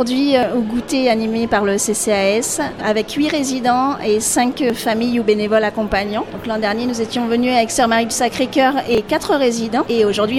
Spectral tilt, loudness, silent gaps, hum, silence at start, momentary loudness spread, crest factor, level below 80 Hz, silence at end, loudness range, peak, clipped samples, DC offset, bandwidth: -3.5 dB/octave; -17 LUFS; none; none; 0 s; 4 LU; 16 dB; -44 dBFS; 0 s; 1 LU; -2 dBFS; under 0.1%; under 0.1%; 16.5 kHz